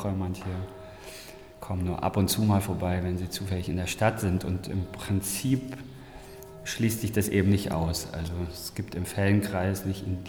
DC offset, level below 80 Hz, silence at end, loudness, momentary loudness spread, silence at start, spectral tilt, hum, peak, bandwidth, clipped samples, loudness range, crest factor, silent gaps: under 0.1%; -48 dBFS; 0 s; -29 LUFS; 18 LU; 0 s; -5.5 dB/octave; none; -10 dBFS; 19 kHz; under 0.1%; 2 LU; 18 dB; none